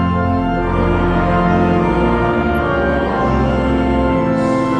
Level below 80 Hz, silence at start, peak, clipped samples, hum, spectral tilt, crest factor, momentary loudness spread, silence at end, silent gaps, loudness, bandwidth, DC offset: -26 dBFS; 0 s; -2 dBFS; under 0.1%; none; -8.5 dB/octave; 12 dB; 2 LU; 0 s; none; -15 LUFS; 12 kHz; under 0.1%